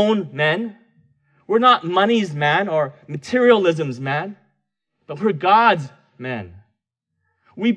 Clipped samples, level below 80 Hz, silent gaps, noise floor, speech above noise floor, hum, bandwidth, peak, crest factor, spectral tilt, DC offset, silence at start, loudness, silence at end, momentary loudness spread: under 0.1%; -68 dBFS; none; -77 dBFS; 59 dB; none; 9.6 kHz; -2 dBFS; 18 dB; -6 dB/octave; under 0.1%; 0 s; -18 LUFS; 0 s; 17 LU